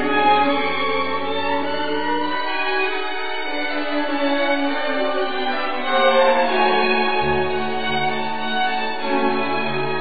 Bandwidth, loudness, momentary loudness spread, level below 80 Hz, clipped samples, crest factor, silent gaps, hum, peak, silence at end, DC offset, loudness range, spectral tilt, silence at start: 5 kHz; -20 LUFS; 7 LU; -52 dBFS; under 0.1%; 16 dB; none; none; -4 dBFS; 0 s; 5%; 3 LU; -9.5 dB/octave; 0 s